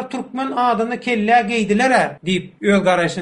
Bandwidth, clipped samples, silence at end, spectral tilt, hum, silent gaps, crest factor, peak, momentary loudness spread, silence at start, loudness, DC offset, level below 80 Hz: 10.5 kHz; under 0.1%; 0 s; -5 dB/octave; none; none; 16 dB; -2 dBFS; 7 LU; 0 s; -17 LUFS; under 0.1%; -52 dBFS